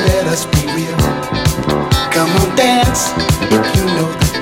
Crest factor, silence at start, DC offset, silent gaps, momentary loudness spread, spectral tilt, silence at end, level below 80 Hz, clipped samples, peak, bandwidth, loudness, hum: 14 dB; 0 s; under 0.1%; none; 4 LU; -4.5 dB/octave; 0 s; -24 dBFS; under 0.1%; 0 dBFS; 17 kHz; -14 LUFS; none